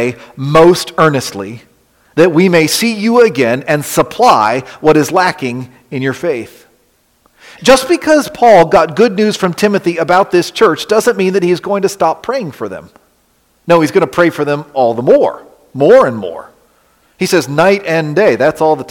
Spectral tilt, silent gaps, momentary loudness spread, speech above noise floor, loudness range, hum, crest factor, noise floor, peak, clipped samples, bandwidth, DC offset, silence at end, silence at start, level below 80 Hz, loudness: -5 dB/octave; none; 14 LU; 44 dB; 4 LU; none; 12 dB; -55 dBFS; 0 dBFS; under 0.1%; 17.5 kHz; under 0.1%; 0.05 s; 0 s; -48 dBFS; -11 LUFS